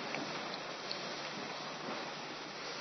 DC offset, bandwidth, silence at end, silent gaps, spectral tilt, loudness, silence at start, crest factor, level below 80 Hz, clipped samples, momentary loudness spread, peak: under 0.1%; 6.2 kHz; 0 s; none; -1 dB/octave; -41 LUFS; 0 s; 20 dB; -82 dBFS; under 0.1%; 3 LU; -22 dBFS